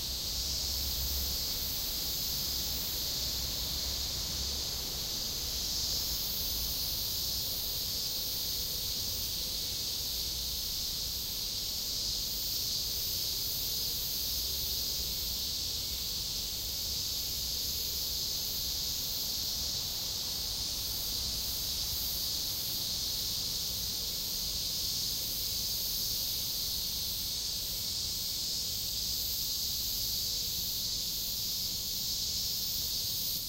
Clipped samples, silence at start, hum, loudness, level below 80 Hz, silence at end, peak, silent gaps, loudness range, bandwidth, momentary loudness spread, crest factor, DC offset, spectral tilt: under 0.1%; 0 s; none; -32 LUFS; -48 dBFS; 0 s; -20 dBFS; none; 1 LU; 16 kHz; 2 LU; 14 dB; under 0.1%; -1 dB/octave